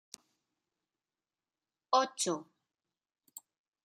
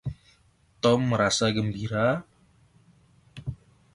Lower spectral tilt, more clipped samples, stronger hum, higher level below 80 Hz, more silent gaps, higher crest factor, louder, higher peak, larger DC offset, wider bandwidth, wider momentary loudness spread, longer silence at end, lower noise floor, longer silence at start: second, -2 dB/octave vs -5 dB/octave; neither; neither; second, under -90 dBFS vs -52 dBFS; neither; first, 26 dB vs 20 dB; second, -33 LUFS vs -25 LUFS; second, -14 dBFS vs -8 dBFS; neither; first, 15 kHz vs 11.5 kHz; first, 23 LU vs 16 LU; first, 1.4 s vs 0.4 s; first, under -90 dBFS vs -62 dBFS; first, 1.9 s vs 0.05 s